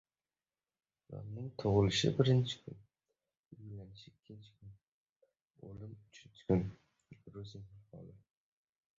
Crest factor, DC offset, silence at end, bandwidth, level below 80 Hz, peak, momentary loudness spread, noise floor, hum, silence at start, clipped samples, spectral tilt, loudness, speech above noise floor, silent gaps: 24 dB; under 0.1%; 0.9 s; 7.6 kHz; -60 dBFS; -14 dBFS; 27 LU; under -90 dBFS; none; 1.1 s; under 0.1%; -6 dB/octave; -34 LUFS; over 55 dB; 3.39-3.44 s, 4.88-5.20 s, 5.42-5.46 s